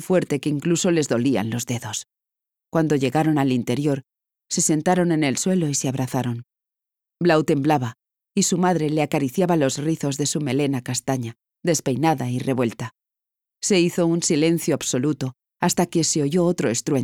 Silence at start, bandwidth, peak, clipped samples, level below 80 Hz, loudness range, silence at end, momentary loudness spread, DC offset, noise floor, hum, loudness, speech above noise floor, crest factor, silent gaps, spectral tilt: 0 s; 17.5 kHz; -6 dBFS; under 0.1%; -64 dBFS; 2 LU; 0 s; 8 LU; under 0.1%; -88 dBFS; none; -22 LUFS; 67 dB; 16 dB; none; -5 dB/octave